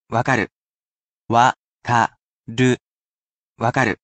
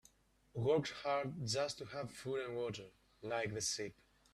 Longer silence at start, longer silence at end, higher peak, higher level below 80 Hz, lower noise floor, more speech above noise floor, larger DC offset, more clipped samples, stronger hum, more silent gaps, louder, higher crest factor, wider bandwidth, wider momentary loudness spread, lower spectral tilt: second, 0.1 s vs 0.55 s; second, 0.1 s vs 0.4 s; first, -2 dBFS vs -22 dBFS; first, -58 dBFS vs -72 dBFS; first, under -90 dBFS vs -70 dBFS; first, over 72 dB vs 30 dB; neither; neither; neither; first, 0.52-1.26 s, 1.56-1.80 s, 2.21-2.44 s, 2.81-3.56 s vs none; first, -20 LUFS vs -40 LUFS; about the same, 20 dB vs 18 dB; second, 9 kHz vs 14 kHz; second, 11 LU vs 14 LU; first, -5.5 dB/octave vs -4 dB/octave